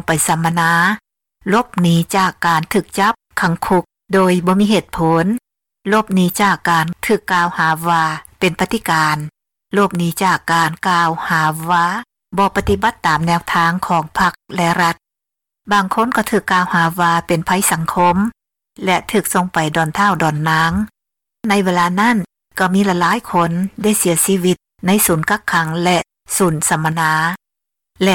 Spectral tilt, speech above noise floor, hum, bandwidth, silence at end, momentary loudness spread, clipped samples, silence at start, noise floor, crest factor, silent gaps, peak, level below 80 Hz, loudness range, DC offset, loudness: -4.5 dB/octave; 68 dB; none; 18 kHz; 0 s; 5 LU; under 0.1%; 0.1 s; -84 dBFS; 12 dB; none; -4 dBFS; -44 dBFS; 1 LU; under 0.1%; -15 LUFS